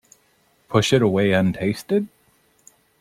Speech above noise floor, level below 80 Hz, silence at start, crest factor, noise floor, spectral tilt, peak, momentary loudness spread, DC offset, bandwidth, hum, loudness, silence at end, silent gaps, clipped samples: 43 dB; -56 dBFS; 0.7 s; 20 dB; -62 dBFS; -6 dB/octave; -2 dBFS; 7 LU; under 0.1%; 15.5 kHz; none; -20 LUFS; 0.95 s; none; under 0.1%